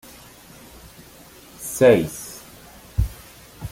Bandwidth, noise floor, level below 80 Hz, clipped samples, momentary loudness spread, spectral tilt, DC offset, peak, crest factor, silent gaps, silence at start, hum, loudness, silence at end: 17 kHz; -46 dBFS; -36 dBFS; under 0.1%; 28 LU; -5.5 dB/octave; under 0.1%; -2 dBFS; 22 dB; none; 1.6 s; none; -21 LUFS; 0.05 s